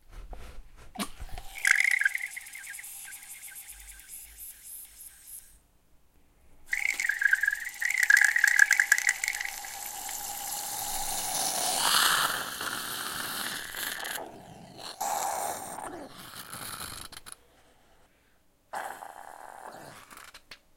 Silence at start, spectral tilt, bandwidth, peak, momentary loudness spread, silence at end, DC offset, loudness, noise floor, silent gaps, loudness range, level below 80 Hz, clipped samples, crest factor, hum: 0.1 s; 0.5 dB/octave; 17 kHz; -4 dBFS; 24 LU; 0.2 s; under 0.1%; -27 LUFS; -65 dBFS; none; 20 LU; -54 dBFS; under 0.1%; 28 dB; none